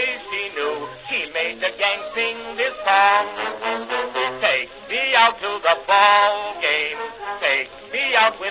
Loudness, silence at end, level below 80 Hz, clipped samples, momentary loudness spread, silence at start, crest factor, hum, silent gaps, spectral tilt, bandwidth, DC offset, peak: -19 LUFS; 0 s; -60 dBFS; under 0.1%; 10 LU; 0 s; 20 dB; none; none; -5 dB/octave; 4 kHz; under 0.1%; -2 dBFS